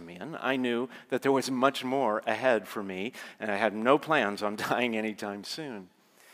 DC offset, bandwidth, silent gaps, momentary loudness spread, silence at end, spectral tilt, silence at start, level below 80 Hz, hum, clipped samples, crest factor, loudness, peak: under 0.1%; 16 kHz; none; 12 LU; 0.5 s; -4.5 dB/octave; 0 s; -84 dBFS; none; under 0.1%; 22 dB; -29 LUFS; -8 dBFS